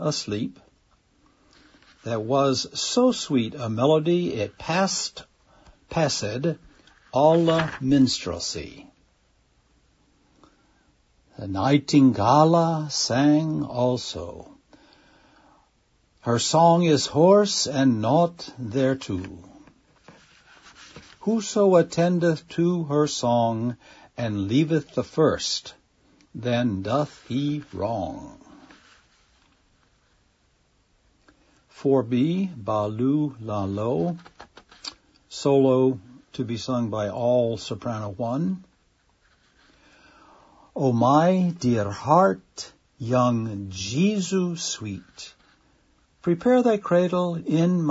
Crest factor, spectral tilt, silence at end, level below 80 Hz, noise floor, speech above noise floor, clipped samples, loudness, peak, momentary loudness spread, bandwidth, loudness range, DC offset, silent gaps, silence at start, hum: 20 dB; -5.5 dB/octave; 0 s; -58 dBFS; -65 dBFS; 43 dB; under 0.1%; -23 LUFS; -4 dBFS; 17 LU; 8 kHz; 8 LU; under 0.1%; none; 0 s; none